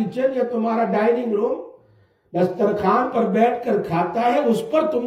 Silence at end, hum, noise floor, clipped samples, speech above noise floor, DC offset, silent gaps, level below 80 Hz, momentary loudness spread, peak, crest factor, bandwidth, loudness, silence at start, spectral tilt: 0 s; none; -57 dBFS; under 0.1%; 37 dB; under 0.1%; none; -62 dBFS; 4 LU; -4 dBFS; 16 dB; 14.5 kHz; -20 LUFS; 0 s; -7.5 dB/octave